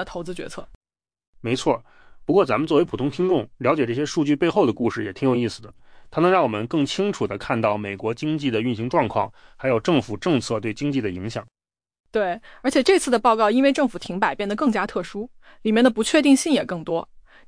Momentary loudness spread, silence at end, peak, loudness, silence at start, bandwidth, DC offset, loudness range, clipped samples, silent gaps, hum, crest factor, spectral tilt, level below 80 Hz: 13 LU; 0.25 s; -6 dBFS; -22 LUFS; 0 s; 10.5 kHz; under 0.1%; 3 LU; under 0.1%; 0.75-0.81 s, 1.27-1.33 s, 12.00-12.04 s; none; 16 dB; -5.5 dB/octave; -52 dBFS